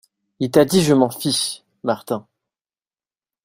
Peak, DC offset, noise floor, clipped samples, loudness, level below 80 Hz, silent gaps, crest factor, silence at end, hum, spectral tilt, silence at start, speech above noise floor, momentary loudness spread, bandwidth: -2 dBFS; under 0.1%; under -90 dBFS; under 0.1%; -19 LUFS; -56 dBFS; none; 20 dB; 1.25 s; none; -5 dB/octave; 0.4 s; over 72 dB; 13 LU; 16 kHz